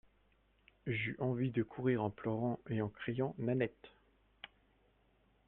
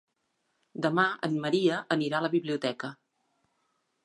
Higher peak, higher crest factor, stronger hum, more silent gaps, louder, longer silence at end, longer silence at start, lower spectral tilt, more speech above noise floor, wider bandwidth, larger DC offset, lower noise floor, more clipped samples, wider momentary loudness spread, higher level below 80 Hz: second, -20 dBFS vs -10 dBFS; about the same, 20 dB vs 20 dB; neither; neither; second, -38 LUFS vs -28 LUFS; about the same, 1 s vs 1.1 s; about the same, 0.85 s vs 0.75 s; first, -10.5 dB/octave vs -6 dB/octave; second, 35 dB vs 49 dB; second, 4 kHz vs 11 kHz; neither; second, -73 dBFS vs -77 dBFS; neither; first, 16 LU vs 11 LU; first, -68 dBFS vs -78 dBFS